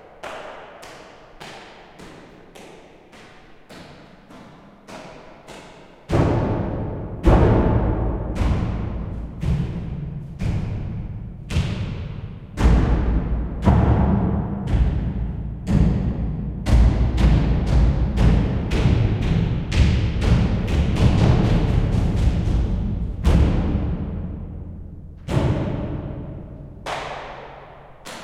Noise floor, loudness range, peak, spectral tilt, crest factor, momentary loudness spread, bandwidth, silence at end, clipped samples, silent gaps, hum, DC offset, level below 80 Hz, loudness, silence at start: -45 dBFS; 9 LU; -2 dBFS; -8 dB/octave; 18 dB; 22 LU; 10 kHz; 0 s; under 0.1%; none; none; under 0.1%; -24 dBFS; -21 LUFS; 0.05 s